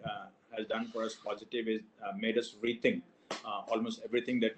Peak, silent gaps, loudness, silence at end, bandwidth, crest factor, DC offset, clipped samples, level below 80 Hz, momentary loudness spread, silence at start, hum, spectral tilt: -14 dBFS; none; -36 LUFS; 0 s; 8.8 kHz; 22 dB; under 0.1%; under 0.1%; -76 dBFS; 11 LU; 0 s; none; -5 dB/octave